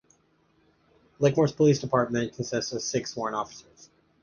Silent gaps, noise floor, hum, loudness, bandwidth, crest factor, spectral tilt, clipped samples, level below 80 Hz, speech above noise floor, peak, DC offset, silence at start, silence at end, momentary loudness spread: none; -66 dBFS; none; -26 LUFS; 10 kHz; 20 dB; -5.5 dB/octave; under 0.1%; -62 dBFS; 40 dB; -8 dBFS; under 0.1%; 1.2 s; 0.6 s; 10 LU